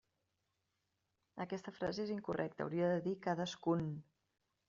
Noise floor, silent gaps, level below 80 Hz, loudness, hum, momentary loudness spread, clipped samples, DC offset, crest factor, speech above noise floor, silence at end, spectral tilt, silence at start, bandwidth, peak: -86 dBFS; none; -74 dBFS; -40 LUFS; none; 9 LU; under 0.1%; under 0.1%; 18 dB; 46 dB; 0.65 s; -6 dB/octave; 1.35 s; 7.4 kHz; -24 dBFS